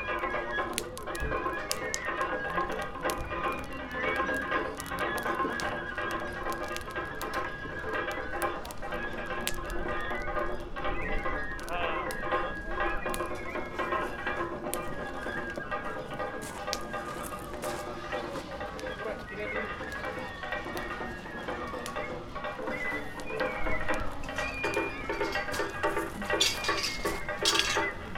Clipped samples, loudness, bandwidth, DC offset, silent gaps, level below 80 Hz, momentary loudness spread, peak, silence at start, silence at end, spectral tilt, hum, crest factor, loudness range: under 0.1%; -33 LUFS; 16.5 kHz; under 0.1%; none; -44 dBFS; 7 LU; -6 dBFS; 0 s; 0 s; -3 dB/octave; none; 26 dB; 6 LU